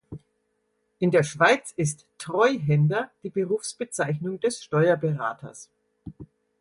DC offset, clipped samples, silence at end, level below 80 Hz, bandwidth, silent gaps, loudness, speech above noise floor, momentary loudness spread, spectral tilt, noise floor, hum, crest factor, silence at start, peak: under 0.1%; under 0.1%; 0.35 s; -62 dBFS; 11.5 kHz; none; -24 LUFS; 49 dB; 19 LU; -5.5 dB/octave; -73 dBFS; none; 20 dB; 0.1 s; -6 dBFS